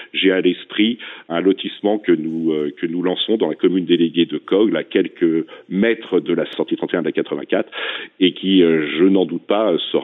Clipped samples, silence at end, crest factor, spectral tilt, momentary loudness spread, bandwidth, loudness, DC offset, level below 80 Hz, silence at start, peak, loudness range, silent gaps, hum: under 0.1%; 0 s; 14 dB; -9 dB/octave; 7 LU; 4.1 kHz; -18 LUFS; under 0.1%; -68 dBFS; 0 s; -4 dBFS; 2 LU; none; none